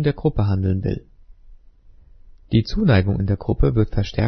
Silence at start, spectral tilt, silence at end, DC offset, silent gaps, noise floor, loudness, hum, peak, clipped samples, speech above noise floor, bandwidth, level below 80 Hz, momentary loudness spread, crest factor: 0 s; -8.5 dB/octave; 0 s; under 0.1%; none; -47 dBFS; -21 LUFS; none; -2 dBFS; under 0.1%; 29 dB; 6.4 kHz; -32 dBFS; 6 LU; 18 dB